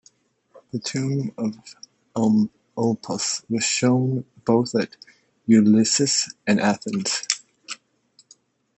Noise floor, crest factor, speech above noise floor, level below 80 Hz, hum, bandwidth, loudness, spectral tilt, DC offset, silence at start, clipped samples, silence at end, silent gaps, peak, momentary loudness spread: -60 dBFS; 20 dB; 39 dB; -68 dBFS; none; 8.6 kHz; -22 LUFS; -4.5 dB/octave; under 0.1%; 0.75 s; under 0.1%; 1.05 s; none; -2 dBFS; 16 LU